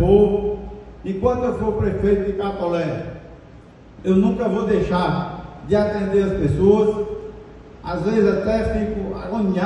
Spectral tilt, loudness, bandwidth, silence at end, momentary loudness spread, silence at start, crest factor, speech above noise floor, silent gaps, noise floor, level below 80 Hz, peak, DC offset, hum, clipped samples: -8.5 dB/octave; -20 LUFS; 9.8 kHz; 0 s; 15 LU; 0 s; 18 dB; 25 dB; none; -43 dBFS; -36 dBFS; -2 dBFS; under 0.1%; none; under 0.1%